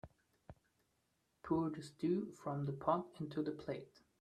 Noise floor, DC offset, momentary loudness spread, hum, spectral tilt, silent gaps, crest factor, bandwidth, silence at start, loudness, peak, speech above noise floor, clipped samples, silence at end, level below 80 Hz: -82 dBFS; under 0.1%; 9 LU; none; -8 dB/octave; none; 22 dB; 10.5 kHz; 0.05 s; -41 LUFS; -20 dBFS; 41 dB; under 0.1%; 0.35 s; -72 dBFS